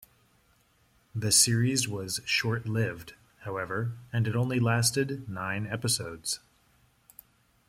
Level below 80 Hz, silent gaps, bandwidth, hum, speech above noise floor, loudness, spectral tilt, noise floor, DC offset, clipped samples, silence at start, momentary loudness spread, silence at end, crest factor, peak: -62 dBFS; none; 16.5 kHz; none; 38 dB; -28 LUFS; -3.5 dB/octave; -66 dBFS; under 0.1%; under 0.1%; 1.15 s; 13 LU; 1.3 s; 22 dB; -8 dBFS